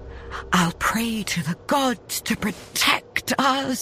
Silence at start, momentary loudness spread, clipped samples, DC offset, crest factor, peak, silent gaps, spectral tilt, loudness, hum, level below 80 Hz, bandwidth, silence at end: 0 s; 7 LU; under 0.1%; under 0.1%; 20 dB; -4 dBFS; none; -3.5 dB/octave; -22 LUFS; none; -46 dBFS; 15.5 kHz; 0 s